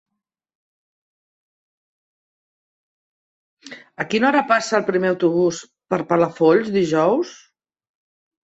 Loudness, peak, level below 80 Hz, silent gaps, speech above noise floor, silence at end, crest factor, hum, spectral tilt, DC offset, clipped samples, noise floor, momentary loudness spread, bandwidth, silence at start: -19 LUFS; -4 dBFS; -64 dBFS; none; over 71 dB; 1.1 s; 18 dB; none; -5.5 dB/octave; under 0.1%; under 0.1%; under -90 dBFS; 14 LU; 8 kHz; 3.65 s